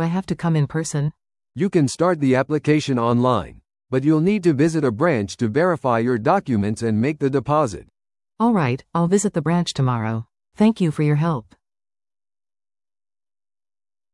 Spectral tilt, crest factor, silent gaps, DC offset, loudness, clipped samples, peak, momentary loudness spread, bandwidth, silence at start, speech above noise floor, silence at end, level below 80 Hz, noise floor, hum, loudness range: -6.5 dB/octave; 18 dB; none; under 0.1%; -20 LUFS; under 0.1%; -4 dBFS; 7 LU; 12 kHz; 0 s; over 71 dB; 2.7 s; -54 dBFS; under -90 dBFS; none; 5 LU